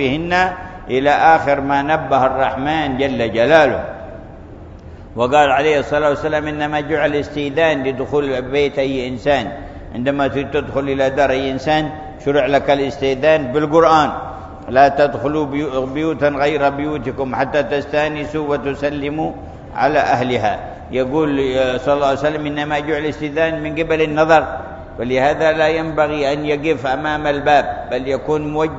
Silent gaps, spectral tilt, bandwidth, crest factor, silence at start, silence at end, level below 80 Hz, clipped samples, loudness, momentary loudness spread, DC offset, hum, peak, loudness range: none; -6 dB/octave; 7.8 kHz; 16 dB; 0 s; 0 s; -40 dBFS; under 0.1%; -17 LUFS; 11 LU; under 0.1%; none; 0 dBFS; 3 LU